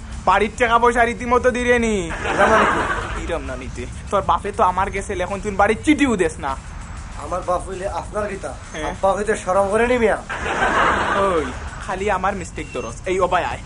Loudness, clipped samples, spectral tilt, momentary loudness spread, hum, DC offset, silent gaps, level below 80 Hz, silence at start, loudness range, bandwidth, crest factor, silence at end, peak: -19 LUFS; under 0.1%; -5 dB/octave; 12 LU; none; under 0.1%; none; -34 dBFS; 0 s; 5 LU; 11 kHz; 16 dB; 0 s; -2 dBFS